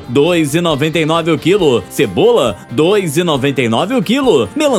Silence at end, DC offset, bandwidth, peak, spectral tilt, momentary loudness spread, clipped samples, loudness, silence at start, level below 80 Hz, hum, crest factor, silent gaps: 0 s; under 0.1%; 16.5 kHz; 0 dBFS; -5.5 dB/octave; 3 LU; under 0.1%; -13 LUFS; 0 s; -44 dBFS; none; 12 dB; none